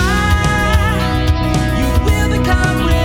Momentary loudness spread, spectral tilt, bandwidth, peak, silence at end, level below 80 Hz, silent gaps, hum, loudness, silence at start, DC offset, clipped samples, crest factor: 2 LU; -5.5 dB/octave; 18 kHz; 0 dBFS; 0 s; -18 dBFS; none; none; -14 LUFS; 0 s; under 0.1%; under 0.1%; 12 dB